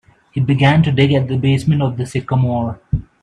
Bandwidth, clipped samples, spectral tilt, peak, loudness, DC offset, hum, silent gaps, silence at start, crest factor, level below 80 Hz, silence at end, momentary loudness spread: 10.5 kHz; under 0.1%; -7.5 dB/octave; 0 dBFS; -16 LUFS; under 0.1%; none; none; 0.35 s; 16 dB; -38 dBFS; 0.2 s; 10 LU